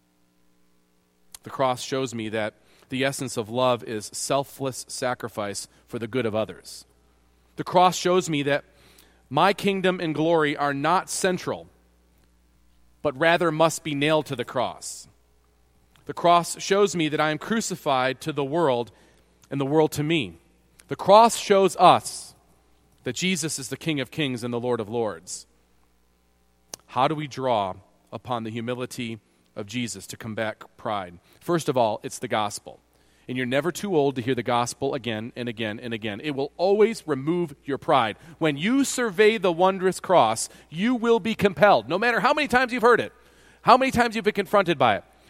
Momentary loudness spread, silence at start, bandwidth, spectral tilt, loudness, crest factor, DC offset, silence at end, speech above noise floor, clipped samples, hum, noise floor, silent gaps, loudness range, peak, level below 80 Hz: 15 LU; 1.45 s; 16.5 kHz; -4.5 dB/octave; -24 LUFS; 24 dB; under 0.1%; 0.3 s; 40 dB; under 0.1%; none; -64 dBFS; none; 9 LU; 0 dBFS; -60 dBFS